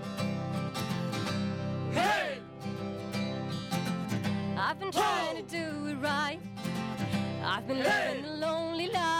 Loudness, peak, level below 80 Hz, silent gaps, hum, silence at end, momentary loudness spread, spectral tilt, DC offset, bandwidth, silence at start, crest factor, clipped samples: -32 LUFS; -16 dBFS; -64 dBFS; none; 50 Hz at -50 dBFS; 0 s; 8 LU; -5 dB/octave; under 0.1%; 16 kHz; 0 s; 16 dB; under 0.1%